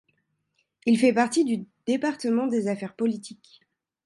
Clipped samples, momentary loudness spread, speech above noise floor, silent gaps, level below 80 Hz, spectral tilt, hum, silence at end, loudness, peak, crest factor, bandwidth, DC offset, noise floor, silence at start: under 0.1%; 10 LU; 50 dB; none; -74 dBFS; -5 dB/octave; none; 0.75 s; -25 LUFS; -10 dBFS; 16 dB; 11.5 kHz; under 0.1%; -74 dBFS; 0.85 s